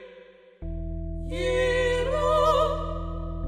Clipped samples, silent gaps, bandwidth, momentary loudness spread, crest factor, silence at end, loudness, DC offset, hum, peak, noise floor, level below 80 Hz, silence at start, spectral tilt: under 0.1%; none; 13.5 kHz; 14 LU; 16 dB; 0 s; -26 LUFS; under 0.1%; none; -10 dBFS; -50 dBFS; -34 dBFS; 0 s; -5.5 dB/octave